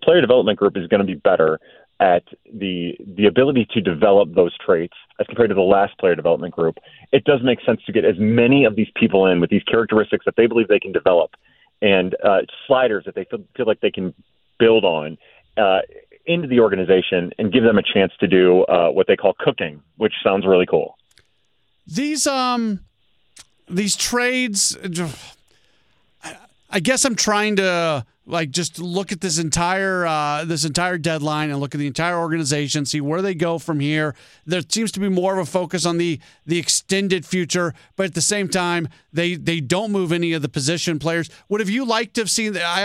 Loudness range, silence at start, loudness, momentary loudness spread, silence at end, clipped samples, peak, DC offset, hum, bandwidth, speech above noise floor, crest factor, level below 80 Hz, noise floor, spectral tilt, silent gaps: 5 LU; 0 s; -19 LUFS; 10 LU; 0 s; under 0.1%; -2 dBFS; under 0.1%; none; 15 kHz; 49 dB; 16 dB; -54 dBFS; -67 dBFS; -4 dB/octave; none